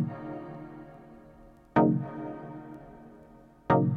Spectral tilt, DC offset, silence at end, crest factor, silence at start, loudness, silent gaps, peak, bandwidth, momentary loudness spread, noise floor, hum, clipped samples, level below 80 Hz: -10.5 dB/octave; under 0.1%; 0 s; 22 dB; 0 s; -30 LUFS; none; -8 dBFS; 4.9 kHz; 26 LU; -54 dBFS; none; under 0.1%; -58 dBFS